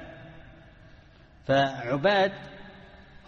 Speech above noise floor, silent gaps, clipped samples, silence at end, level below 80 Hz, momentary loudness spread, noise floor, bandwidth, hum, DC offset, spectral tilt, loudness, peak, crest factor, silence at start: 29 dB; none; under 0.1%; 0.25 s; -56 dBFS; 24 LU; -54 dBFS; 7.2 kHz; none; under 0.1%; -6 dB/octave; -25 LUFS; -10 dBFS; 20 dB; 0 s